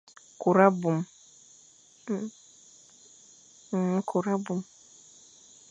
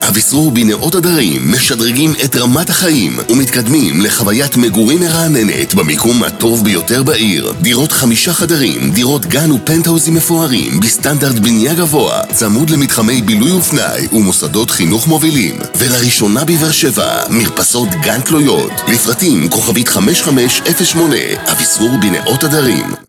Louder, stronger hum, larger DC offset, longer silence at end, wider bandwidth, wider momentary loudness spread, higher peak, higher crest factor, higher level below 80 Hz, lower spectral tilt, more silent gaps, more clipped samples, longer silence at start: second, -27 LUFS vs -10 LUFS; neither; neither; first, 1.05 s vs 0.1 s; second, 9.2 kHz vs 18.5 kHz; first, 19 LU vs 2 LU; second, -6 dBFS vs 0 dBFS; first, 24 dB vs 10 dB; second, -78 dBFS vs -42 dBFS; first, -7 dB/octave vs -3.5 dB/octave; neither; neither; first, 0.4 s vs 0 s